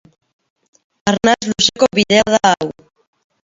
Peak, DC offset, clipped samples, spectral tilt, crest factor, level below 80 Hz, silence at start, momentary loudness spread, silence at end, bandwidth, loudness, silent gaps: 0 dBFS; under 0.1%; under 0.1%; -3 dB/octave; 16 dB; -50 dBFS; 1.05 s; 8 LU; 0.75 s; 7.8 kHz; -14 LUFS; none